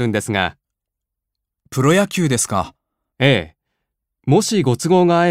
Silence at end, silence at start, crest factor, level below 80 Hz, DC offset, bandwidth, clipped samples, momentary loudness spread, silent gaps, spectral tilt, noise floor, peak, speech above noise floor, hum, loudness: 0 s; 0 s; 18 dB; -52 dBFS; under 0.1%; 16 kHz; under 0.1%; 12 LU; none; -5 dB/octave; -82 dBFS; 0 dBFS; 66 dB; none; -17 LUFS